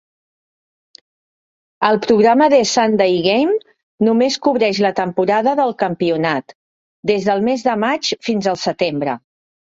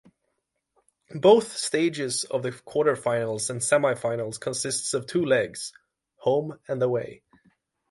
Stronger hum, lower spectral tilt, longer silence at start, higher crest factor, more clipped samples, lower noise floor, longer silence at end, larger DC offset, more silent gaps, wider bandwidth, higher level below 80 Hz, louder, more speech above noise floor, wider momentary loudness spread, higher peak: neither; about the same, -4.5 dB/octave vs -4 dB/octave; first, 1.8 s vs 1.1 s; about the same, 16 dB vs 20 dB; neither; first, under -90 dBFS vs -78 dBFS; second, 0.55 s vs 0.75 s; neither; first, 3.83-3.98 s, 6.55-7.03 s vs none; second, 7.8 kHz vs 11.5 kHz; first, -60 dBFS vs -68 dBFS; first, -16 LUFS vs -25 LUFS; first, over 75 dB vs 53 dB; second, 7 LU vs 10 LU; first, 0 dBFS vs -6 dBFS